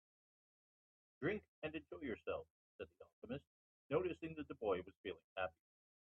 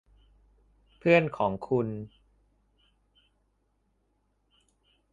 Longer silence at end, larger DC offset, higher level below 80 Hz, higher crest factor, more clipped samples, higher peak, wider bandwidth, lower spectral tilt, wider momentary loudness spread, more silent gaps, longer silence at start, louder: second, 0.5 s vs 3.05 s; neither; second, -76 dBFS vs -62 dBFS; about the same, 22 dB vs 24 dB; neither; second, -26 dBFS vs -8 dBFS; second, 5.8 kHz vs 7.4 kHz; second, -4.5 dB/octave vs -8 dB/octave; about the same, 14 LU vs 16 LU; first, 1.48-1.62 s, 2.50-2.79 s, 3.13-3.22 s, 3.47-3.89 s, 4.97-5.04 s, 5.24-5.36 s vs none; first, 1.2 s vs 1.05 s; second, -46 LUFS vs -27 LUFS